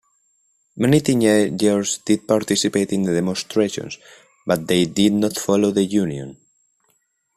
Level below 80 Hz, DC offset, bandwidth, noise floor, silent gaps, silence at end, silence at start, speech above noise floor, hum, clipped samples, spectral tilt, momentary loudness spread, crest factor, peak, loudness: -56 dBFS; under 0.1%; 14.5 kHz; -67 dBFS; none; 1 s; 0.75 s; 48 dB; none; under 0.1%; -5 dB/octave; 11 LU; 16 dB; -4 dBFS; -19 LUFS